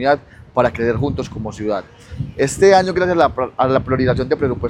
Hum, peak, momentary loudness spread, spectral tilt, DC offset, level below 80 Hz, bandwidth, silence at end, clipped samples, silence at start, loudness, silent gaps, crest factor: none; 0 dBFS; 13 LU; -6 dB/octave; under 0.1%; -38 dBFS; 12 kHz; 0 s; under 0.1%; 0 s; -17 LUFS; none; 16 dB